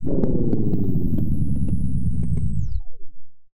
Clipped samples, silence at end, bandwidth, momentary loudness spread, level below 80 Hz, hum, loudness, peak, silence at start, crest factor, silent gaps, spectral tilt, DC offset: under 0.1%; 0.2 s; 1.4 kHz; 5 LU; -28 dBFS; none; -24 LUFS; -6 dBFS; 0 s; 12 dB; none; -11.5 dB/octave; under 0.1%